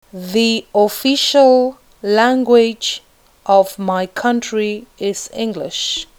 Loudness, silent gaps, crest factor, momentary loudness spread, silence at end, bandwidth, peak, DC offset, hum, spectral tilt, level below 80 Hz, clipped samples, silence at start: -15 LUFS; none; 16 dB; 11 LU; 0.15 s; over 20 kHz; 0 dBFS; under 0.1%; none; -3.5 dB/octave; -54 dBFS; under 0.1%; 0.15 s